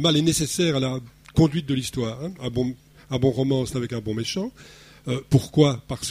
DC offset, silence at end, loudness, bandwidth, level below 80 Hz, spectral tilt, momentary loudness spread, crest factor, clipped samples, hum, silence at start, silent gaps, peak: under 0.1%; 0 s; -24 LUFS; 15.5 kHz; -46 dBFS; -5.5 dB/octave; 10 LU; 20 dB; under 0.1%; none; 0 s; none; -4 dBFS